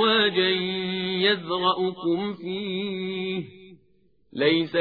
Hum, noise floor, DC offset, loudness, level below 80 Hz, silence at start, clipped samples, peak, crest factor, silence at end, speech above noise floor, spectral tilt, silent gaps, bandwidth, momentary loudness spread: none; -65 dBFS; under 0.1%; -25 LUFS; -68 dBFS; 0 s; under 0.1%; -8 dBFS; 18 dB; 0 s; 40 dB; -7.5 dB/octave; none; 5 kHz; 10 LU